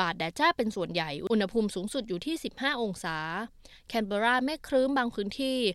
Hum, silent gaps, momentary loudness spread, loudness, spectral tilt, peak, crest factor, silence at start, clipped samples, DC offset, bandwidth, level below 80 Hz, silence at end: none; none; 8 LU; -30 LUFS; -4.5 dB/octave; -10 dBFS; 18 dB; 0 s; under 0.1%; under 0.1%; 14.5 kHz; -58 dBFS; 0 s